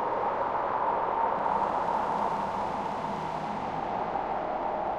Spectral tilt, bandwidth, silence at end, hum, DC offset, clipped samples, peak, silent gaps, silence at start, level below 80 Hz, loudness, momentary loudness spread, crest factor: -6 dB/octave; 10.5 kHz; 0 s; none; under 0.1%; under 0.1%; -14 dBFS; none; 0 s; -56 dBFS; -30 LUFS; 5 LU; 16 dB